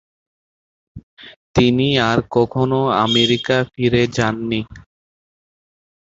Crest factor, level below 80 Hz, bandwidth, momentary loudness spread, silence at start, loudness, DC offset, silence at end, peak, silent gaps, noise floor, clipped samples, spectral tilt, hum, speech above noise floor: 18 dB; -44 dBFS; 7.8 kHz; 8 LU; 0.95 s; -17 LUFS; under 0.1%; 1.3 s; -2 dBFS; 1.03-1.17 s, 1.36-1.54 s; under -90 dBFS; under 0.1%; -5.5 dB/octave; none; over 73 dB